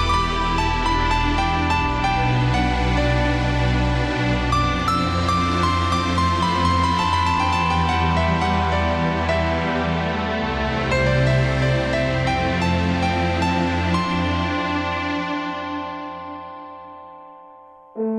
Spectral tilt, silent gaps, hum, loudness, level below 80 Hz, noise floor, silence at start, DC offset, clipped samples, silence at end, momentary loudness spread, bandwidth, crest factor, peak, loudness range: -6 dB/octave; none; none; -20 LUFS; -30 dBFS; -45 dBFS; 0 s; under 0.1%; under 0.1%; 0 s; 8 LU; 11 kHz; 14 dB; -6 dBFS; 4 LU